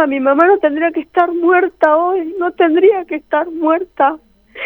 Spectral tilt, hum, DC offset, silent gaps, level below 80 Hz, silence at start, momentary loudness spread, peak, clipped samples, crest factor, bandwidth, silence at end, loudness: -6 dB/octave; none; under 0.1%; none; -56 dBFS; 0 s; 8 LU; 0 dBFS; under 0.1%; 14 dB; 4.2 kHz; 0 s; -14 LUFS